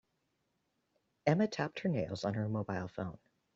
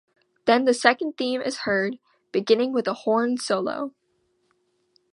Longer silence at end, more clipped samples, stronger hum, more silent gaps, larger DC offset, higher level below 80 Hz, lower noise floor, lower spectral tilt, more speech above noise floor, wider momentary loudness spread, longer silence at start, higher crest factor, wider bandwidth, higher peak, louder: second, 0.4 s vs 1.25 s; neither; neither; neither; neither; about the same, -70 dBFS vs -72 dBFS; first, -81 dBFS vs -70 dBFS; first, -6.5 dB/octave vs -4 dB/octave; about the same, 46 dB vs 47 dB; about the same, 10 LU vs 10 LU; first, 1.25 s vs 0.45 s; about the same, 22 dB vs 24 dB; second, 7.8 kHz vs 11 kHz; second, -14 dBFS vs 0 dBFS; second, -36 LUFS vs -23 LUFS